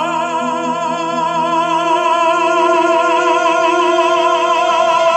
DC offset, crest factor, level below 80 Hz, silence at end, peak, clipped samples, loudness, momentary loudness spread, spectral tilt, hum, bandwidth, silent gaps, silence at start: under 0.1%; 12 dB; -64 dBFS; 0 s; -2 dBFS; under 0.1%; -14 LUFS; 5 LU; -3.5 dB/octave; none; 11.5 kHz; none; 0 s